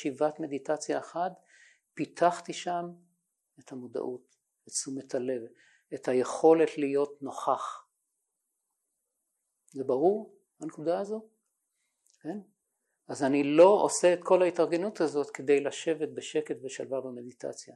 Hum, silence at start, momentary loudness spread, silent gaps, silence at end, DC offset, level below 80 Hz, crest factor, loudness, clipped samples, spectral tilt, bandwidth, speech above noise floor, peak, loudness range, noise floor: none; 0 s; 19 LU; none; 0.05 s; under 0.1%; -86 dBFS; 22 dB; -29 LUFS; under 0.1%; -4.5 dB/octave; 12 kHz; 54 dB; -8 dBFS; 10 LU; -83 dBFS